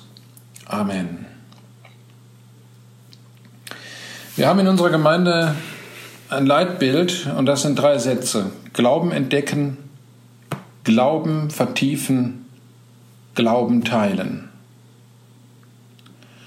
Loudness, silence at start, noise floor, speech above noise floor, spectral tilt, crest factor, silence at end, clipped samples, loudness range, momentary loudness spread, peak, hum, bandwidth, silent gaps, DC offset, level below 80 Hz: -19 LUFS; 0.7 s; -49 dBFS; 30 dB; -5.5 dB/octave; 18 dB; 2 s; under 0.1%; 13 LU; 19 LU; -2 dBFS; none; 16 kHz; none; under 0.1%; -68 dBFS